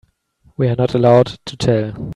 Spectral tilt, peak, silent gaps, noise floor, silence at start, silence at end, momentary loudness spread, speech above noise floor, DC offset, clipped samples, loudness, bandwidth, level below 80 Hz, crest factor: -7.5 dB/octave; 0 dBFS; none; -55 dBFS; 0.6 s; 0 s; 9 LU; 40 dB; under 0.1%; under 0.1%; -16 LUFS; 10.5 kHz; -46 dBFS; 16 dB